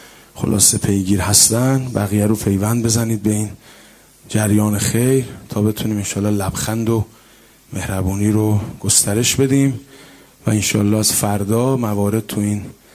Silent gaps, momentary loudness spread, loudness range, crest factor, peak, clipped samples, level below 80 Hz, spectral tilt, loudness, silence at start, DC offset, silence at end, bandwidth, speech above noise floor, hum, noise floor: none; 10 LU; 5 LU; 18 dB; 0 dBFS; under 0.1%; -38 dBFS; -4.5 dB/octave; -16 LUFS; 0 s; under 0.1%; 0.25 s; 16 kHz; 31 dB; none; -48 dBFS